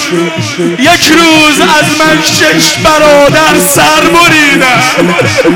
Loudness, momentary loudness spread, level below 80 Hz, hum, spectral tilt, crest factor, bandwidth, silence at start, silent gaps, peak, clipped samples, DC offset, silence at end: -4 LUFS; 5 LU; -34 dBFS; none; -3 dB/octave; 6 dB; 19 kHz; 0 s; none; 0 dBFS; 0.6%; 0.2%; 0 s